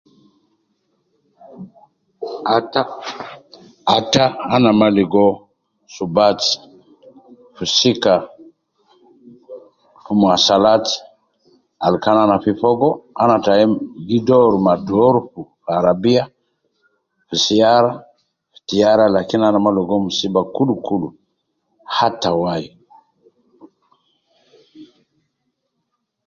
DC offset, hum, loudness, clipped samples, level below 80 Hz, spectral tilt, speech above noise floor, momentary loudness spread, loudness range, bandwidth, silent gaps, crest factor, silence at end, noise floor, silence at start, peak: under 0.1%; none; -16 LUFS; under 0.1%; -54 dBFS; -5 dB/octave; 58 dB; 14 LU; 8 LU; 7.4 kHz; none; 18 dB; 1.4 s; -73 dBFS; 1.55 s; 0 dBFS